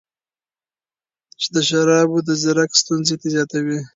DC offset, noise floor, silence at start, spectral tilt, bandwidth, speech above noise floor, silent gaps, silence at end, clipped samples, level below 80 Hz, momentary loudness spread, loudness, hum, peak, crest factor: under 0.1%; under -90 dBFS; 1.4 s; -3.5 dB/octave; 7.8 kHz; over 72 dB; none; 0.1 s; under 0.1%; -66 dBFS; 7 LU; -17 LUFS; none; 0 dBFS; 18 dB